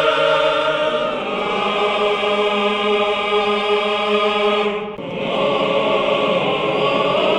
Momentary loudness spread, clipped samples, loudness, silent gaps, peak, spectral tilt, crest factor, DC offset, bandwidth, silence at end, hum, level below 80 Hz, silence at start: 5 LU; under 0.1%; -18 LUFS; none; -4 dBFS; -4.5 dB/octave; 14 dB; under 0.1%; 9.8 kHz; 0 s; none; -54 dBFS; 0 s